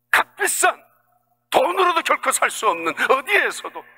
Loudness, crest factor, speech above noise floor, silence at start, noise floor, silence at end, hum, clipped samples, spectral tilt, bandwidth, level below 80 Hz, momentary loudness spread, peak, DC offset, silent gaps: -19 LUFS; 20 dB; 44 dB; 0.15 s; -65 dBFS; 0.15 s; 60 Hz at -60 dBFS; under 0.1%; -0.5 dB/octave; 16.5 kHz; -66 dBFS; 5 LU; -2 dBFS; under 0.1%; none